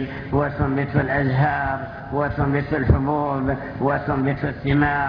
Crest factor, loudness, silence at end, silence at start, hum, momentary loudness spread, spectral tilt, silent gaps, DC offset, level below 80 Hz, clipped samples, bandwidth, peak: 16 dB; -22 LUFS; 0 s; 0 s; none; 6 LU; -10.5 dB/octave; none; under 0.1%; -34 dBFS; under 0.1%; 5.4 kHz; -6 dBFS